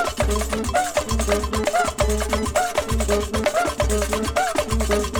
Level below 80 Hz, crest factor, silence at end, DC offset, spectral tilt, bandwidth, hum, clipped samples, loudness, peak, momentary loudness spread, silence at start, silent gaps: -28 dBFS; 16 dB; 0 s; under 0.1%; -4 dB/octave; over 20 kHz; none; under 0.1%; -22 LUFS; -6 dBFS; 2 LU; 0 s; none